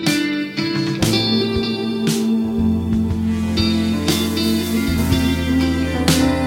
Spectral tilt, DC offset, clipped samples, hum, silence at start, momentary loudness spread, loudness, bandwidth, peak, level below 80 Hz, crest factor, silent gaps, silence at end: -5 dB/octave; under 0.1%; under 0.1%; none; 0 s; 4 LU; -18 LUFS; 17 kHz; 0 dBFS; -32 dBFS; 18 dB; none; 0 s